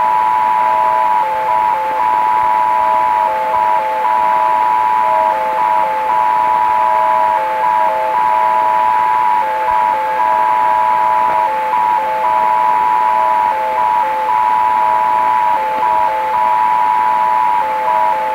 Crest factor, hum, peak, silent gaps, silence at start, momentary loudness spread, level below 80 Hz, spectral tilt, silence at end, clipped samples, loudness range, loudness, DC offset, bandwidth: 10 dB; none; -2 dBFS; none; 0 s; 2 LU; -52 dBFS; -3.5 dB/octave; 0 s; under 0.1%; 1 LU; -13 LUFS; under 0.1%; 16 kHz